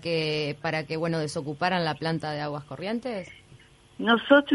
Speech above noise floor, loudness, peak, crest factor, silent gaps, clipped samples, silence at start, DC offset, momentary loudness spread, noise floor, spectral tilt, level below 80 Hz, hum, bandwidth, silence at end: 28 dB; -27 LUFS; -6 dBFS; 20 dB; none; under 0.1%; 0 s; under 0.1%; 11 LU; -54 dBFS; -5.5 dB/octave; -64 dBFS; none; 11.5 kHz; 0 s